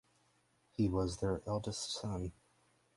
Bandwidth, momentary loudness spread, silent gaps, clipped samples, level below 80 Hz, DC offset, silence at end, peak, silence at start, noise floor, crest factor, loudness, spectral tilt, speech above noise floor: 11.5 kHz; 9 LU; none; under 0.1%; -54 dBFS; under 0.1%; 0.65 s; -20 dBFS; 0.8 s; -74 dBFS; 18 dB; -38 LUFS; -5.5 dB/octave; 37 dB